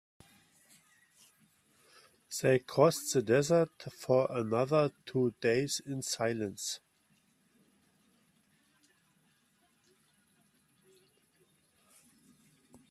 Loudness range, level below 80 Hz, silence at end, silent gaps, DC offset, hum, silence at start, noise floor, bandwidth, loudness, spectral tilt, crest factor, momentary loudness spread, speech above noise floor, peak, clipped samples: 11 LU; -74 dBFS; 6.15 s; none; under 0.1%; none; 2.3 s; -72 dBFS; 15.5 kHz; -31 LUFS; -5 dB/octave; 22 dB; 10 LU; 41 dB; -12 dBFS; under 0.1%